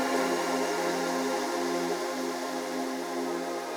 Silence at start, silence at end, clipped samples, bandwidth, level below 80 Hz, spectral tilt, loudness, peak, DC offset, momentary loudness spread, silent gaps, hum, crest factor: 0 s; 0 s; under 0.1%; over 20 kHz; -74 dBFS; -3 dB/octave; -30 LUFS; -16 dBFS; under 0.1%; 5 LU; none; none; 14 dB